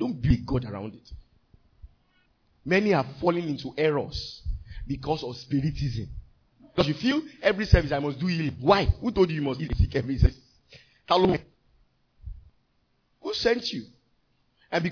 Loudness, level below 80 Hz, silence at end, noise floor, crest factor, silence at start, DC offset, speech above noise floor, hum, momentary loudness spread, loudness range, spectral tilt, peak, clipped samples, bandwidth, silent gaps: -26 LUFS; -36 dBFS; 0 s; -70 dBFS; 24 dB; 0 s; under 0.1%; 44 dB; none; 16 LU; 6 LU; -7 dB/octave; -4 dBFS; under 0.1%; 5.4 kHz; none